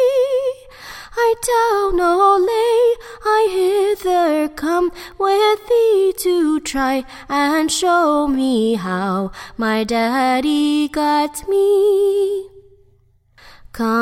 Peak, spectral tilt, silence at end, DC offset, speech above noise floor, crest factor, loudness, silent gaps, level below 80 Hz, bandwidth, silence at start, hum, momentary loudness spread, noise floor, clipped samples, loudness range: -2 dBFS; -4 dB/octave; 0 s; under 0.1%; 39 dB; 14 dB; -17 LUFS; none; -44 dBFS; 16.5 kHz; 0 s; none; 9 LU; -55 dBFS; under 0.1%; 2 LU